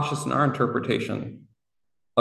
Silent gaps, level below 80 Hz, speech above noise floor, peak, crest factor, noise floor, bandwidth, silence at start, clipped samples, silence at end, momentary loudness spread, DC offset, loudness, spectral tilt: none; -64 dBFS; 58 dB; -6 dBFS; 20 dB; -84 dBFS; 12.5 kHz; 0 s; under 0.1%; 0 s; 10 LU; under 0.1%; -25 LUFS; -6 dB/octave